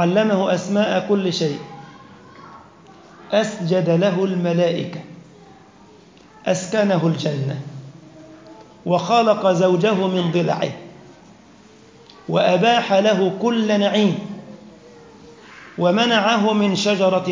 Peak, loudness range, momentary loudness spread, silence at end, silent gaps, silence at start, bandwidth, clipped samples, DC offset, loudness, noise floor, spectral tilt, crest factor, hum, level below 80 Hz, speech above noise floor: -4 dBFS; 4 LU; 15 LU; 0 s; none; 0 s; 7.6 kHz; under 0.1%; under 0.1%; -18 LUFS; -47 dBFS; -5.5 dB/octave; 16 dB; none; -64 dBFS; 29 dB